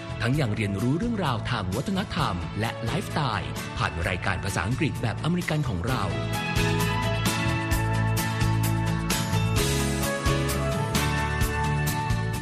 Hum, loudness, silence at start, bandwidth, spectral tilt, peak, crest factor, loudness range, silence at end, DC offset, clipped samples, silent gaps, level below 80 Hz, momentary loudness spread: none; -26 LUFS; 0 s; 14.5 kHz; -5 dB/octave; -10 dBFS; 16 dB; 3 LU; 0 s; under 0.1%; under 0.1%; none; -36 dBFS; 3 LU